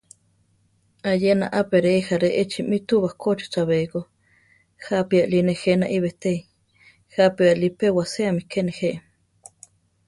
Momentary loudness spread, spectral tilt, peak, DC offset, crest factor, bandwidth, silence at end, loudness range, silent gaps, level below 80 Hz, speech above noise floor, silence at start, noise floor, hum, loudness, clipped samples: 9 LU; -6.5 dB/octave; -6 dBFS; under 0.1%; 18 dB; 11.5 kHz; 1.1 s; 2 LU; none; -60 dBFS; 43 dB; 1.05 s; -64 dBFS; none; -22 LUFS; under 0.1%